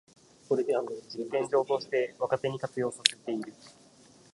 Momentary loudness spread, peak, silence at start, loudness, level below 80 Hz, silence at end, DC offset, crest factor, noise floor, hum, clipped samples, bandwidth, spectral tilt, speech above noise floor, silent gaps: 10 LU; 0 dBFS; 0.5 s; -30 LUFS; -76 dBFS; 0.6 s; under 0.1%; 32 dB; -58 dBFS; none; under 0.1%; 11.5 kHz; -3.5 dB/octave; 27 dB; none